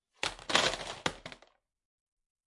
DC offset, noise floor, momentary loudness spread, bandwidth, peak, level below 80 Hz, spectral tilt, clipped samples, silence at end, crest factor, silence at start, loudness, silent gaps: under 0.1%; -66 dBFS; 18 LU; 11.5 kHz; -6 dBFS; -60 dBFS; -1.5 dB/octave; under 0.1%; 1.1 s; 30 dB; 0.25 s; -32 LUFS; none